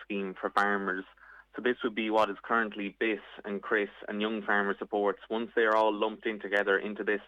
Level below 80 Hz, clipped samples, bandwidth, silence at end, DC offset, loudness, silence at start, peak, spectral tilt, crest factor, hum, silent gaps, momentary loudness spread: -72 dBFS; under 0.1%; 10 kHz; 0 s; under 0.1%; -30 LUFS; 0 s; -10 dBFS; -6 dB/octave; 22 dB; none; none; 9 LU